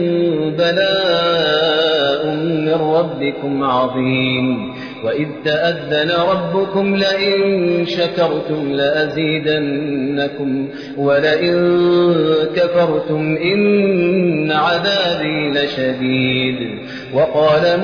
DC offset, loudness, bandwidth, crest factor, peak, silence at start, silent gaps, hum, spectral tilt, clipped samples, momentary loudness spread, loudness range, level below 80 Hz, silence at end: 0.1%; -16 LUFS; 5.4 kHz; 12 dB; -4 dBFS; 0 s; none; none; -7 dB/octave; under 0.1%; 6 LU; 3 LU; -54 dBFS; 0 s